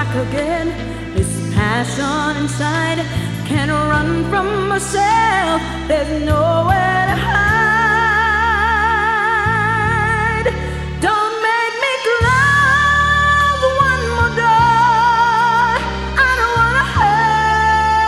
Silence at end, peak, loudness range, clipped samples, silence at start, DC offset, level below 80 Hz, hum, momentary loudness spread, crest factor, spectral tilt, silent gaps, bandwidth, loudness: 0 s; -2 dBFS; 5 LU; under 0.1%; 0 s; under 0.1%; -30 dBFS; none; 7 LU; 14 dB; -5 dB/octave; none; 14 kHz; -15 LUFS